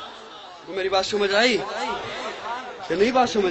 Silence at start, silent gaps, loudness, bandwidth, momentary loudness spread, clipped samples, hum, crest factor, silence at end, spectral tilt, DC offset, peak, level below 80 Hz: 0 s; none; -23 LUFS; 8.4 kHz; 18 LU; under 0.1%; none; 18 dB; 0 s; -3 dB/octave; under 0.1%; -6 dBFS; -56 dBFS